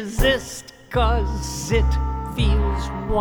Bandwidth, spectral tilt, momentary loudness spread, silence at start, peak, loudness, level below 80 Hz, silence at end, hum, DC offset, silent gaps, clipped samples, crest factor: over 20 kHz; -5 dB/octave; 7 LU; 0 s; -6 dBFS; -22 LUFS; -24 dBFS; 0 s; none; under 0.1%; none; under 0.1%; 16 dB